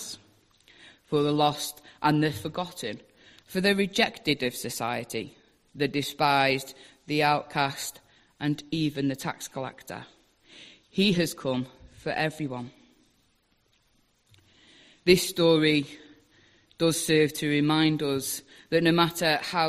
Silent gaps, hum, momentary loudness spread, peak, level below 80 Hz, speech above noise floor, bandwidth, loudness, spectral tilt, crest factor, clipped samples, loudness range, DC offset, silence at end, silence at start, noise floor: none; none; 15 LU; -4 dBFS; -62 dBFS; 42 dB; 15.5 kHz; -26 LUFS; -4.5 dB/octave; 24 dB; under 0.1%; 7 LU; under 0.1%; 0 s; 0 s; -68 dBFS